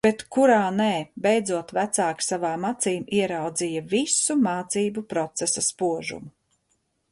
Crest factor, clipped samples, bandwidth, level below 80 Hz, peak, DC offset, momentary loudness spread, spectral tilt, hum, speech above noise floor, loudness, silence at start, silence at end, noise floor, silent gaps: 18 dB; under 0.1%; 11.5 kHz; -64 dBFS; -6 dBFS; under 0.1%; 7 LU; -3.5 dB/octave; none; 48 dB; -24 LUFS; 0.05 s; 0.85 s; -72 dBFS; none